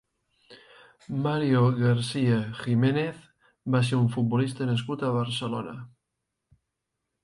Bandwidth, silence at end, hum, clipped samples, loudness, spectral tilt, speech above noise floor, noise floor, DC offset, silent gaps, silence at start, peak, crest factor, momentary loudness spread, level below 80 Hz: 11 kHz; 1.35 s; none; under 0.1%; -26 LUFS; -7 dB/octave; 58 dB; -83 dBFS; under 0.1%; none; 0.5 s; -12 dBFS; 16 dB; 11 LU; -64 dBFS